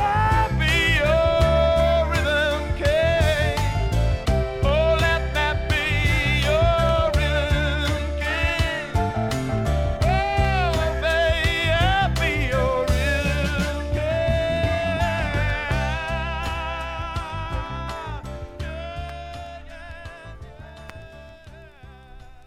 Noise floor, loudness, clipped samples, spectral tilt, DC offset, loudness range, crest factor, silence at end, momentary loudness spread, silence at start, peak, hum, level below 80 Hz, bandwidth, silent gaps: -44 dBFS; -22 LUFS; under 0.1%; -5.5 dB/octave; under 0.1%; 13 LU; 16 dB; 0.05 s; 15 LU; 0 s; -6 dBFS; none; -28 dBFS; 15.5 kHz; none